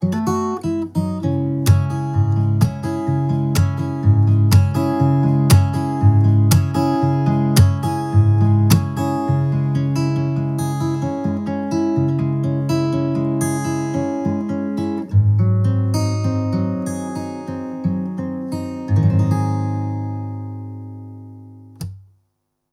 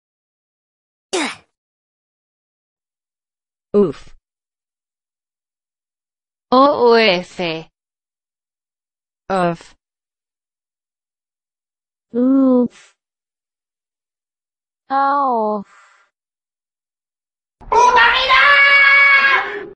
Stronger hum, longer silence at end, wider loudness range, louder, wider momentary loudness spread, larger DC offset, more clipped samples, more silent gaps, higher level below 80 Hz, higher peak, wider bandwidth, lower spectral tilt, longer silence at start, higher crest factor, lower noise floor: neither; first, 0.7 s vs 0.05 s; second, 6 LU vs 14 LU; second, -18 LUFS vs -13 LUFS; second, 12 LU vs 16 LU; neither; neither; second, none vs 1.57-2.76 s; first, -44 dBFS vs -52 dBFS; about the same, -2 dBFS vs 0 dBFS; first, 15.5 kHz vs 10.5 kHz; first, -7.5 dB/octave vs -4 dB/octave; second, 0 s vs 1.15 s; about the same, 16 dB vs 18 dB; second, -71 dBFS vs under -90 dBFS